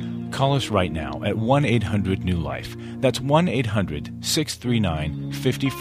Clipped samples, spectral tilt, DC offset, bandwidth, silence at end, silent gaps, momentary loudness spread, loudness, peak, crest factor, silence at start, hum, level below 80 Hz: under 0.1%; -5.5 dB/octave; under 0.1%; 15.5 kHz; 0 s; none; 9 LU; -23 LUFS; -4 dBFS; 18 dB; 0 s; none; -42 dBFS